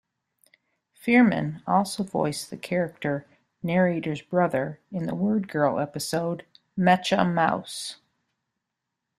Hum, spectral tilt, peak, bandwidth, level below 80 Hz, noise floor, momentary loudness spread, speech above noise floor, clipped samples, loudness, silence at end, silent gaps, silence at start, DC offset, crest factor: none; -5.5 dB/octave; -6 dBFS; 14.5 kHz; -66 dBFS; -83 dBFS; 13 LU; 59 dB; under 0.1%; -25 LUFS; 1.25 s; none; 1.05 s; under 0.1%; 22 dB